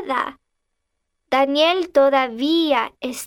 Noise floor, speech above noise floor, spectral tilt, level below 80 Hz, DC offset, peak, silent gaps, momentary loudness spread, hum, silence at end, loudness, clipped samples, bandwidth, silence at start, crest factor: -75 dBFS; 56 dB; -2 dB/octave; -62 dBFS; under 0.1%; -4 dBFS; none; 8 LU; none; 0 s; -18 LUFS; under 0.1%; 16.5 kHz; 0 s; 16 dB